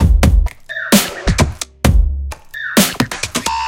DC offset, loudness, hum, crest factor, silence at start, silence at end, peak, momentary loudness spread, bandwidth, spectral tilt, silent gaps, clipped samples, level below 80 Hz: under 0.1%; -16 LUFS; none; 14 dB; 0 s; 0 s; 0 dBFS; 11 LU; 17 kHz; -4.5 dB/octave; none; under 0.1%; -18 dBFS